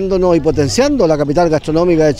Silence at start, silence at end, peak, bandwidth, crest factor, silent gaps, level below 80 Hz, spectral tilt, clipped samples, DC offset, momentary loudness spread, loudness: 0 s; 0 s; 0 dBFS; 13 kHz; 12 dB; none; -30 dBFS; -6 dB/octave; under 0.1%; under 0.1%; 2 LU; -13 LUFS